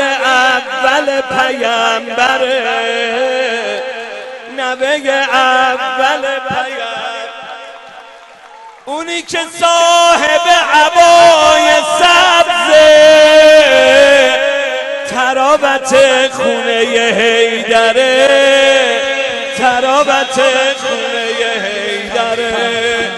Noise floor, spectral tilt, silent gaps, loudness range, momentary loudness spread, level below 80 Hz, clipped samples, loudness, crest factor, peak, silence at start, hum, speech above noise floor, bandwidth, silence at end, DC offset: -36 dBFS; -1.5 dB/octave; none; 9 LU; 13 LU; -48 dBFS; under 0.1%; -10 LUFS; 10 dB; 0 dBFS; 0 s; none; 26 dB; 12 kHz; 0 s; under 0.1%